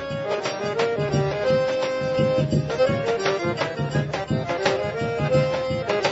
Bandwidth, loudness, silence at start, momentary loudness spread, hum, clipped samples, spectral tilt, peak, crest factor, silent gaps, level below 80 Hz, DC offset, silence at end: 8 kHz; -23 LUFS; 0 s; 4 LU; none; under 0.1%; -6 dB/octave; -6 dBFS; 16 dB; none; -48 dBFS; under 0.1%; 0 s